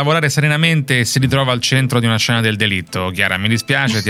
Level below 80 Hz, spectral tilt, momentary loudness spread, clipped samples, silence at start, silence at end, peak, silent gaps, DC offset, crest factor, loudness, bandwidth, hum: -46 dBFS; -4.5 dB/octave; 3 LU; under 0.1%; 0 s; 0 s; 0 dBFS; none; under 0.1%; 16 dB; -15 LUFS; 16 kHz; none